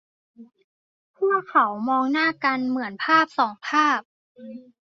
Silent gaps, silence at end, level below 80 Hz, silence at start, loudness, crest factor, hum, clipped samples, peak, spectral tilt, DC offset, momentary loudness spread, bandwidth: 0.64-1.14 s, 4.05-4.35 s; 0.25 s; -76 dBFS; 0.4 s; -22 LUFS; 18 dB; none; under 0.1%; -6 dBFS; -4 dB/octave; under 0.1%; 8 LU; 7.6 kHz